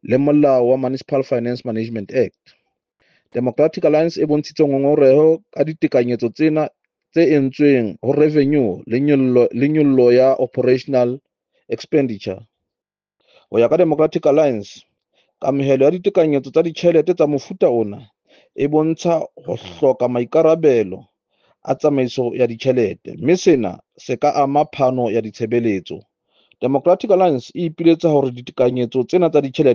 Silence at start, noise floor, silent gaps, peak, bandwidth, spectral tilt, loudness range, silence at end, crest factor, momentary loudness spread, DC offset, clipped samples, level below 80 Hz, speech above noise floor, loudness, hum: 0.1 s; -88 dBFS; none; -2 dBFS; 7.2 kHz; -7.5 dB/octave; 4 LU; 0 s; 16 dB; 11 LU; under 0.1%; under 0.1%; -62 dBFS; 72 dB; -17 LUFS; none